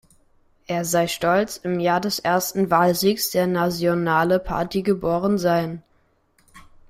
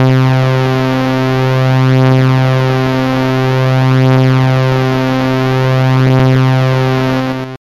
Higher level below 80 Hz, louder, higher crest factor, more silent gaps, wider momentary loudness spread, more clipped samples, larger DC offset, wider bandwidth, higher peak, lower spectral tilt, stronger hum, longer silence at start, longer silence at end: second, -48 dBFS vs -40 dBFS; second, -21 LUFS vs -11 LUFS; first, 16 dB vs 10 dB; neither; about the same, 6 LU vs 4 LU; neither; second, under 0.1% vs 1%; first, 16 kHz vs 7.2 kHz; second, -6 dBFS vs 0 dBFS; second, -5 dB/octave vs -7.5 dB/octave; neither; first, 0.7 s vs 0 s; first, 0.3 s vs 0.1 s